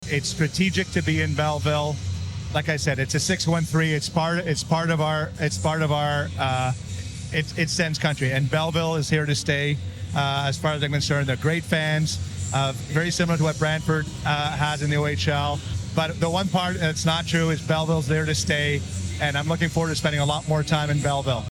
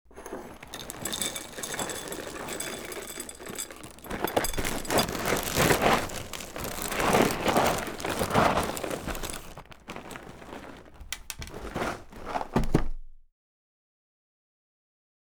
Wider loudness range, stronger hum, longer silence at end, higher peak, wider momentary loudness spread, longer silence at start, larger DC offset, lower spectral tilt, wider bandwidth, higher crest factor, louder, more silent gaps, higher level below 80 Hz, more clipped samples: second, 1 LU vs 10 LU; neither; second, 0 s vs 2.05 s; about the same, -8 dBFS vs -6 dBFS; second, 5 LU vs 19 LU; about the same, 0 s vs 0.1 s; second, under 0.1% vs 0.1%; first, -5 dB/octave vs -3.5 dB/octave; second, 13.5 kHz vs over 20 kHz; second, 16 dB vs 24 dB; first, -24 LUFS vs -29 LUFS; neither; about the same, -44 dBFS vs -42 dBFS; neither